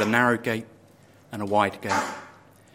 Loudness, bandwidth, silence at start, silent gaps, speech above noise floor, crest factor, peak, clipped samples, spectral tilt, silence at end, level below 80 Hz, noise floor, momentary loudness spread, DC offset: -25 LUFS; 16.5 kHz; 0 s; none; 30 dB; 22 dB; -4 dBFS; under 0.1%; -5 dB/octave; 0.45 s; -66 dBFS; -54 dBFS; 15 LU; under 0.1%